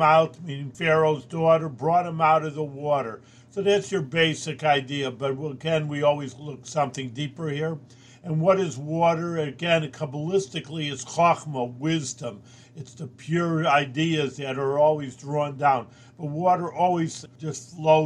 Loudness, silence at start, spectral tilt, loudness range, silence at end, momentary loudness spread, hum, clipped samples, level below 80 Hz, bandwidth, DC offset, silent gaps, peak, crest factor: -25 LUFS; 0 s; -5.5 dB/octave; 4 LU; 0 s; 13 LU; none; under 0.1%; -68 dBFS; 10.5 kHz; under 0.1%; none; -6 dBFS; 18 dB